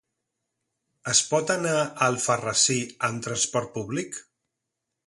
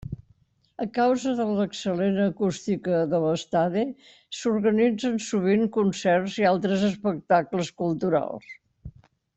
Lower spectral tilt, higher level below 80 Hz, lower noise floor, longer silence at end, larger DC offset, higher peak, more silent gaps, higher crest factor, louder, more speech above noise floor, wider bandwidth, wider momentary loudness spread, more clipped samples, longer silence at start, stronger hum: second, -2.5 dB/octave vs -6 dB/octave; second, -66 dBFS vs -58 dBFS; first, -83 dBFS vs -63 dBFS; first, 0.85 s vs 0.45 s; neither; about the same, -6 dBFS vs -8 dBFS; neither; about the same, 22 dB vs 18 dB; about the same, -24 LUFS vs -25 LUFS; first, 58 dB vs 39 dB; first, 11.5 kHz vs 8.2 kHz; first, 11 LU vs 8 LU; neither; first, 1.05 s vs 0.05 s; neither